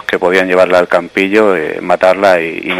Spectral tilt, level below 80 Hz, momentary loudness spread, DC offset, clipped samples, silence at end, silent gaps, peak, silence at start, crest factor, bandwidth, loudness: -5 dB/octave; -50 dBFS; 4 LU; under 0.1%; 0.6%; 0 s; none; 0 dBFS; 0.1 s; 10 dB; 15.5 kHz; -11 LUFS